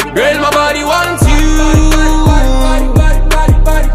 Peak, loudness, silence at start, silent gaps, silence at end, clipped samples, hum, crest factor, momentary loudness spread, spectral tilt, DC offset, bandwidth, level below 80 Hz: 0 dBFS; -11 LUFS; 0 s; none; 0 s; under 0.1%; none; 8 dB; 2 LU; -5 dB/octave; under 0.1%; 15 kHz; -10 dBFS